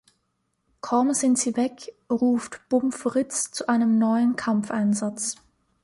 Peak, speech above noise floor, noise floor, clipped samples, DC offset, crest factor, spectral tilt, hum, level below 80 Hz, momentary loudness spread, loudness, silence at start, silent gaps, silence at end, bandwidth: -10 dBFS; 51 dB; -74 dBFS; under 0.1%; under 0.1%; 14 dB; -4.5 dB/octave; none; -68 dBFS; 9 LU; -24 LUFS; 0.85 s; none; 0.5 s; 11.5 kHz